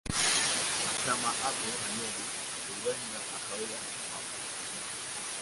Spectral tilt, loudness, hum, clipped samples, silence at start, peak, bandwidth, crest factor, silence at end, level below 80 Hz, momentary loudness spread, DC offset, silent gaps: -0.5 dB/octave; -32 LUFS; none; under 0.1%; 0.05 s; -14 dBFS; 12 kHz; 20 dB; 0 s; -60 dBFS; 10 LU; under 0.1%; none